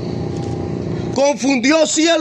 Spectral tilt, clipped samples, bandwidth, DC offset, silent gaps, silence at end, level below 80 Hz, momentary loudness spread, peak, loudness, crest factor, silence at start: -4 dB/octave; under 0.1%; 10 kHz; under 0.1%; none; 0 s; -46 dBFS; 10 LU; -2 dBFS; -17 LUFS; 14 dB; 0 s